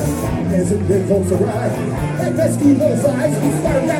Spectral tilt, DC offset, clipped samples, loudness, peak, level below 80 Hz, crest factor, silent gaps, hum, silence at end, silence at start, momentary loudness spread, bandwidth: -7 dB/octave; under 0.1%; under 0.1%; -17 LUFS; -2 dBFS; -36 dBFS; 14 dB; none; none; 0 s; 0 s; 6 LU; 18 kHz